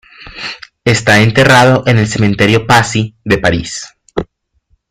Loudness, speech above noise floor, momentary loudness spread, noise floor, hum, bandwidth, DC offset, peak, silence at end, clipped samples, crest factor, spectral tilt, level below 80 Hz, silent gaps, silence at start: -10 LUFS; 48 dB; 17 LU; -58 dBFS; none; 15.5 kHz; under 0.1%; 0 dBFS; 0.65 s; under 0.1%; 12 dB; -5 dB/octave; -38 dBFS; none; 0.2 s